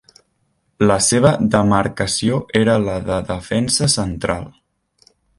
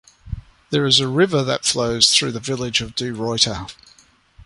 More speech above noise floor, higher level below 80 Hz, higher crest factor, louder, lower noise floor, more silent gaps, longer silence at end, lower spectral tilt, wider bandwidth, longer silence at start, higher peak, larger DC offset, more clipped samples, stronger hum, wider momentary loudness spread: first, 49 dB vs 31 dB; about the same, -40 dBFS vs -44 dBFS; about the same, 18 dB vs 20 dB; about the same, -17 LUFS vs -18 LUFS; first, -66 dBFS vs -50 dBFS; neither; first, 0.9 s vs 0 s; first, -4.5 dB/octave vs -3 dB/octave; about the same, 11.5 kHz vs 11.5 kHz; first, 0.8 s vs 0.25 s; about the same, 0 dBFS vs 0 dBFS; neither; neither; neither; second, 9 LU vs 21 LU